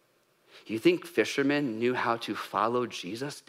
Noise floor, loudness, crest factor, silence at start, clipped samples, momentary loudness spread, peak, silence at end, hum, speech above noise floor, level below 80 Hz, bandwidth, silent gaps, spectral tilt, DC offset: -67 dBFS; -29 LUFS; 18 dB; 0.55 s; under 0.1%; 9 LU; -12 dBFS; 0.1 s; none; 38 dB; -82 dBFS; 15.5 kHz; none; -5 dB/octave; under 0.1%